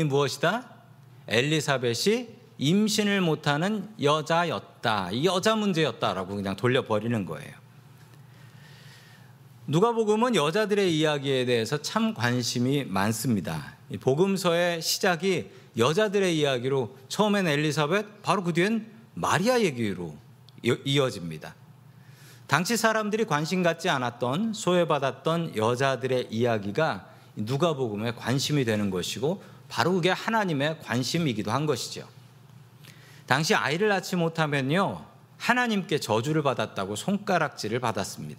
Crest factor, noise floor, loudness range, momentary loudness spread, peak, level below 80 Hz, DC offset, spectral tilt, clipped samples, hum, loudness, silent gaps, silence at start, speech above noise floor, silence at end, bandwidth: 24 dB; -51 dBFS; 3 LU; 8 LU; -4 dBFS; -68 dBFS; under 0.1%; -5 dB/octave; under 0.1%; none; -26 LUFS; none; 0 s; 25 dB; 0 s; 16 kHz